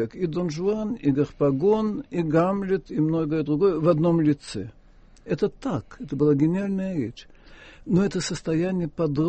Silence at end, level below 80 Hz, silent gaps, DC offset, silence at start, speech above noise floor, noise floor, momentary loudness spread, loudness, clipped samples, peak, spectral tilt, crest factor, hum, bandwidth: 0 s; -50 dBFS; none; under 0.1%; 0 s; 27 dB; -51 dBFS; 10 LU; -24 LUFS; under 0.1%; -6 dBFS; -7.5 dB/octave; 18 dB; none; 8.4 kHz